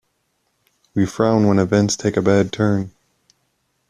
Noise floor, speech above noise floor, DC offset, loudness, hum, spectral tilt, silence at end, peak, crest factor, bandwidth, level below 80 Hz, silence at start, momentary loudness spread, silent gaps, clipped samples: -69 dBFS; 52 dB; under 0.1%; -18 LUFS; none; -6 dB/octave; 1 s; -2 dBFS; 16 dB; 11 kHz; -52 dBFS; 0.95 s; 8 LU; none; under 0.1%